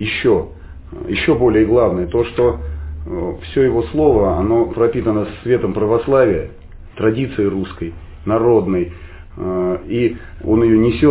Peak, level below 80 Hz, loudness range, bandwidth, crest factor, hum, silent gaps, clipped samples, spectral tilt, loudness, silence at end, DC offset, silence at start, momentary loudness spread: -2 dBFS; -32 dBFS; 3 LU; 4 kHz; 14 dB; none; none; under 0.1%; -11.5 dB/octave; -16 LUFS; 0 s; under 0.1%; 0 s; 14 LU